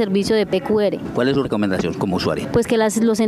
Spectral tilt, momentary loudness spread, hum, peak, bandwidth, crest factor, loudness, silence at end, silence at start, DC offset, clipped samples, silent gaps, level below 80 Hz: -5.5 dB/octave; 4 LU; none; -4 dBFS; 15 kHz; 14 dB; -19 LUFS; 0 s; 0 s; under 0.1%; under 0.1%; none; -44 dBFS